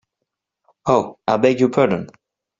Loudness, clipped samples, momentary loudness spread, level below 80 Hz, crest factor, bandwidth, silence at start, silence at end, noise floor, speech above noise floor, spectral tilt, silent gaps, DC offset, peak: -18 LUFS; under 0.1%; 11 LU; -56 dBFS; 18 dB; 7.6 kHz; 0.85 s; 0.55 s; -80 dBFS; 63 dB; -5.5 dB/octave; none; under 0.1%; -2 dBFS